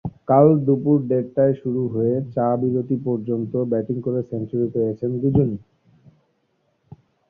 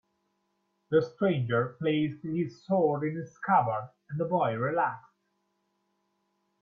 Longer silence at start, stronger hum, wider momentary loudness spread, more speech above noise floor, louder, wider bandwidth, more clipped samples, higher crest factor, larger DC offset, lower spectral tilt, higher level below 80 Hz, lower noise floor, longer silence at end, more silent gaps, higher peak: second, 0.05 s vs 0.9 s; neither; about the same, 9 LU vs 9 LU; about the same, 48 dB vs 48 dB; first, -21 LUFS vs -29 LUFS; second, 3.3 kHz vs 6.6 kHz; neither; about the same, 18 dB vs 18 dB; neither; first, -13.5 dB/octave vs -8.5 dB/octave; first, -52 dBFS vs -72 dBFS; second, -68 dBFS vs -77 dBFS; about the same, 1.7 s vs 1.6 s; neither; first, -2 dBFS vs -12 dBFS